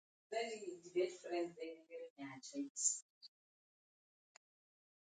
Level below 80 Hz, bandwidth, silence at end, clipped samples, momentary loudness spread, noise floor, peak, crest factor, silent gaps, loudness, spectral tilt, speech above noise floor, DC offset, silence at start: under -90 dBFS; 9.4 kHz; 1.8 s; under 0.1%; 16 LU; under -90 dBFS; -22 dBFS; 26 dB; 2.10-2.16 s, 2.70-2.75 s, 3.02-3.21 s; -43 LUFS; -2 dB/octave; over 46 dB; under 0.1%; 0.3 s